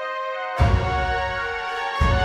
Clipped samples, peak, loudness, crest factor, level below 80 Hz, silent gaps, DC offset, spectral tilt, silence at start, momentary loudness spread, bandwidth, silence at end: under 0.1%; -6 dBFS; -23 LUFS; 16 dB; -28 dBFS; none; under 0.1%; -6 dB/octave; 0 s; 7 LU; 10 kHz; 0 s